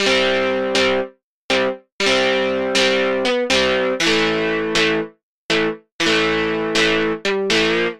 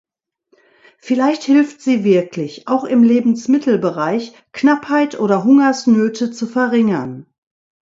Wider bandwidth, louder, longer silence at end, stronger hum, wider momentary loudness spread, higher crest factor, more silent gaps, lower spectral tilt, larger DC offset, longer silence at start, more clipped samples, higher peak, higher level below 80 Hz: first, 14 kHz vs 7.8 kHz; about the same, -17 LUFS vs -15 LUFS; second, 0 s vs 0.6 s; neither; second, 5 LU vs 10 LU; about the same, 18 dB vs 16 dB; first, 1.23-1.49 s, 1.92-1.99 s, 5.23-5.49 s, 5.92-5.99 s vs none; second, -3 dB/octave vs -6 dB/octave; neither; second, 0 s vs 1.05 s; neither; about the same, -2 dBFS vs 0 dBFS; first, -46 dBFS vs -64 dBFS